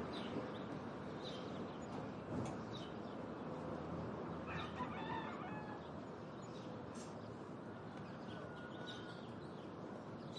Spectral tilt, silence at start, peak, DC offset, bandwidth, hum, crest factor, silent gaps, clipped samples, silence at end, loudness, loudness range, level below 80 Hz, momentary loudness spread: -6.5 dB/octave; 0 s; -32 dBFS; under 0.1%; 11 kHz; none; 16 dB; none; under 0.1%; 0 s; -48 LUFS; 4 LU; -72 dBFS; 6 LU